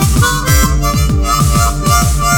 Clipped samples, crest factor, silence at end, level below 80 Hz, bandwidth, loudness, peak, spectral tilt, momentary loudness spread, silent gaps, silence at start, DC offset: under 0.1%; 10 dB; 0 s; -16 dBFS; over 20 kHz; -12 LUFS; 0 dBFS; -4 dB/octave; 2 LU; none; 0 s; under 0.1%